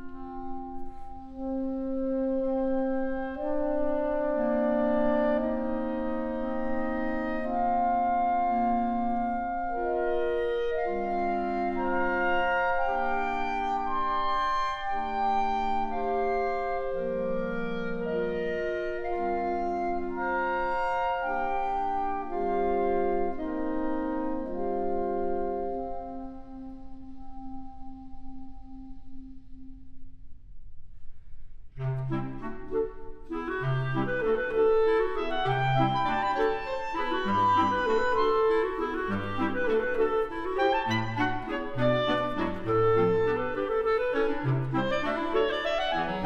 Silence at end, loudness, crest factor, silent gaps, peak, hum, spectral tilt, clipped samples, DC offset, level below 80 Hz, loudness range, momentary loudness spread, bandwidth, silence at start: 0 s; -29 LUFS; 16 dB; none; -12 dBFS; none; -7.5 dB/octave; under 0.1%; under 0.1%; -46 dBFS; 10 LU; 14 LU; 7.4 kHz; 0 s